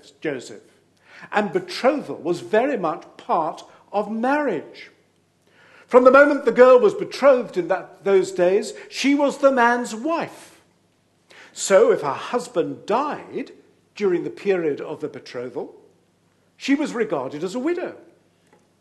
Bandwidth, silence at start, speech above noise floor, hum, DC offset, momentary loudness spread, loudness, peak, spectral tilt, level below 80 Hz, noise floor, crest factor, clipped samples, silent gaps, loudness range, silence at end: 12 kHz; 0.25 s; 42 dB; none; under 0.1%; 17 LU; -20 LUFS; 0 dBFS; -4.5 dB/octave; -72 dBFS; -62 dBFS; 22 dB; under 0.1%; none; 10 LU; 0.85 s